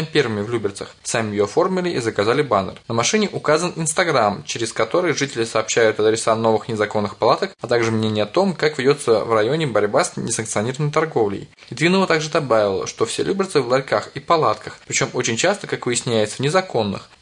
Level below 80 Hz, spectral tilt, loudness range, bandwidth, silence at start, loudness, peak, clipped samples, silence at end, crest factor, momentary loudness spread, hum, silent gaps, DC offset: -58 dBFS; -4 dB/octave; 1 LU; 11 kHz; 0 s; -19 LUFS; -2 dBFS; under 0.1%; 0.15 s; 16 dB; 6 LU; none; none; under 0.1%